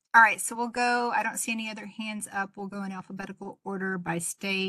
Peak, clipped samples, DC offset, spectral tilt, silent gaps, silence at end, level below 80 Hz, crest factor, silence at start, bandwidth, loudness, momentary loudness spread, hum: -6 dBFS; under 0.1%; under 0.1%; -3 dB/octave; none; 0 s; -72 dBFS; 22 dB; 0.15 s; 13 kHz; -28 LUFS; 16 LU; none